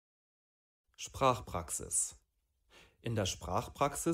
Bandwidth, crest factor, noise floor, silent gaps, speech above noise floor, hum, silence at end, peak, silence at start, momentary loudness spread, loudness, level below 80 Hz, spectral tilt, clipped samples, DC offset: 16 kHz; 22 dB; -74 dBFS; none; 39 dB; none; 0 s; -16 dBFS; 1 s; 11 LU; -35 LUFS; -58 dBFS; -3.5 dB/octave; under 0.1%; under 0.1%